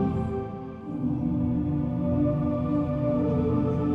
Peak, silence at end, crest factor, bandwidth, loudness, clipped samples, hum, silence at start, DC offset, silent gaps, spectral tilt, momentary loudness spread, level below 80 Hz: -14 dBFS; 0 s; 12 dB; 5 kHz; -27 LUFS; under 0.1%; none; 0 s; under 0.1%; none; -11.5 dB/octave; 7 LU; -42 dBFS